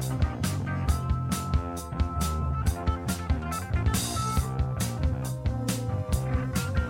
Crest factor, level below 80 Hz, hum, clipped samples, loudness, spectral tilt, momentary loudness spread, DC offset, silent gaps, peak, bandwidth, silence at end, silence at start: 16 dB; -32 dBFS; none; under 0.1%; -29 LUFS; -5.5 dB/octave; 3 LU; under 0.1%; none; -12 dBFS; 16.5 kHz; 0 s; 0 s